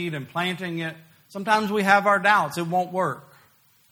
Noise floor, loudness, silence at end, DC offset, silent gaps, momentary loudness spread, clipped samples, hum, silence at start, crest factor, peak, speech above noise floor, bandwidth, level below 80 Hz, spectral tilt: -59 dBFS; -22 LUFS; 0.7 s; under 0.1%; none; 15 LU; under 0.1%; none; 0 s; 22 dB; -2 dBFS; 36 dB; over 20 kHz; -70 dBFS; -5 dB/octave